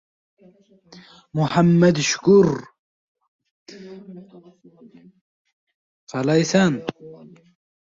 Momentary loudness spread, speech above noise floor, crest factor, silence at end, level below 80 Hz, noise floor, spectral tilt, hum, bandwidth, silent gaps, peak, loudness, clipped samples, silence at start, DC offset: 25 LU; 29 dB; 18 dB; 0.7 s; -58 dBFS; -49 dBFS; -5.5 dB/octave; none; 7.8 kHz; 2.79-3.15 s, 3.28-3.39 s, 3.51-3.66 s, 5.21-5.45 s, 5.53-5.67 s, 5.75-6.07 s; -4 dBFS; -18 LUFS; under 0.1%; 1.35 s; under 0.1%